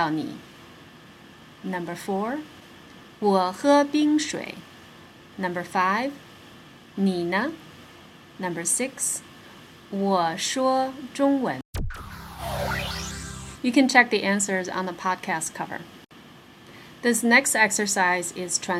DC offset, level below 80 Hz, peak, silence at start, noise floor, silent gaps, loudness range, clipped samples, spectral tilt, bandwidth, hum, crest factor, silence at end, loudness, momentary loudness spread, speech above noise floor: under 0.1%; -48 dBFS; -2 dBFS; 0 s; -48 dBFS; 11.65-11.73 s; 5 LU; under 0.1%; -3.5 dB/octave; 16 kHz; none; 24 dB; 0 s; -24 LUFS; 19 LU; 24 dB